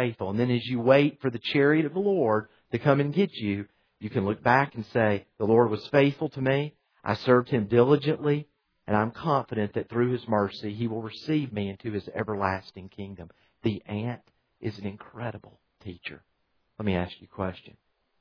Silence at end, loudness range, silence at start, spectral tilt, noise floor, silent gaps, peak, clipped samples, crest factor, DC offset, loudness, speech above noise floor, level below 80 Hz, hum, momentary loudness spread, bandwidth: 0.5 s; 12 LU; 0 s; -8.5 dB/octave; -70 dBFS; none; -6 dBFS; under 0.1%; 22 dB; under 0.1%; -27 LUFS; 44 dB; -62 dBFS; none; 16 LU; 5.4 kHz